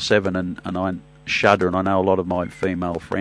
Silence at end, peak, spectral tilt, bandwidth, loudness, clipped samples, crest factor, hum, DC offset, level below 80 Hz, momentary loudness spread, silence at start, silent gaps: 0 s; 0 dBFS; -5.5 dB/octave; 10.5 kHz; -21 LUFS; under 0.1%; 20 dB; none; under 0.1%; -50 dBFS; 9 LU; 0 s; none